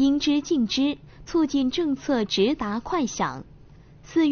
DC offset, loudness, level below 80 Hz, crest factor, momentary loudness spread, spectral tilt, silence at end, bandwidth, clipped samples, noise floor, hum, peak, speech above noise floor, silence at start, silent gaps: under 0.1%; -24 LUFS; -50 dBFS; 16 dB; 6 LU; -3.5 dB/octave; 0 s; 6.8 kHz; under 0.1%; -49 dBFS; none; -10 dBFS; 25 dB; 0 s; none